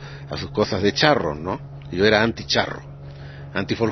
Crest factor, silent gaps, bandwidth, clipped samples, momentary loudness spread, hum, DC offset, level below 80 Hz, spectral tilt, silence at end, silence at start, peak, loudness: 22 dB; none; 6.4 kHz; under 0.1%; 19 LU; none; under 0.1%; -46 dBFS; -5 dB/octave; 0 s; 0 s; 0 dBFS; -21 LUFS